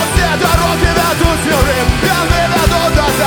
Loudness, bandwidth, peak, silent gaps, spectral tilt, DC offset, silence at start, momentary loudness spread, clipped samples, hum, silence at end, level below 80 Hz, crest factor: -12 LUFS; over 20 kHz; 0 dBFS; none; -4.5 dB/octave; under 0.1%; 0 s; 1 LU; under 0.1%; none; 0 s; -18 dBFS; 12 dB